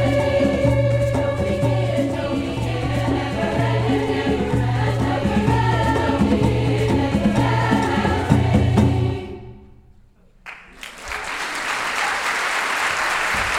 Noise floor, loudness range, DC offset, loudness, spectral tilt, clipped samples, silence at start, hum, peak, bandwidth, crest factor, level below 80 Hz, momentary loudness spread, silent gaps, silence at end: -51 dBFS; 6 LU; under 0.1%; -20 LUFS; -6 dB/octave; under 0.1%; 0 s; none; 0 dBFS; 14.5 kHz; 18 dB; -34 dBFS; 7 LU; none; 0 s